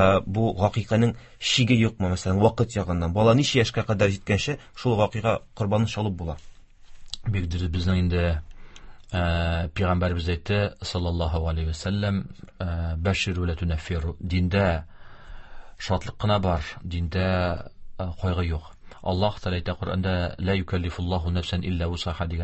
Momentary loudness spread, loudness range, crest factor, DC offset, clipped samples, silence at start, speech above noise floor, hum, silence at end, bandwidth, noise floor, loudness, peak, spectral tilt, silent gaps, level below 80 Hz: 9 LU; 6 LU; 18 dB; under 0.1%; under 0.1%; 0 s; 20 dB; none; 0 s; 8.4 kHz; -44 dBFS; -25 LUFS; -6 dBFS; -6 dB/octave; none; -34 dBFS